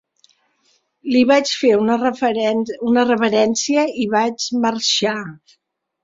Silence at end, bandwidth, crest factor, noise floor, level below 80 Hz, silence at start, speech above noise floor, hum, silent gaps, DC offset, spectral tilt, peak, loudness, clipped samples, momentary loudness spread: 0.7 s; 7.8 kHz; 16 dB; -63 dBFS; -62 dBFS; 1.05 s; 46 dB; none; none; under 0.1%; -3.5 dB/octave; -2 dBFS; -17 LUFS; under 0.1%; 6 LU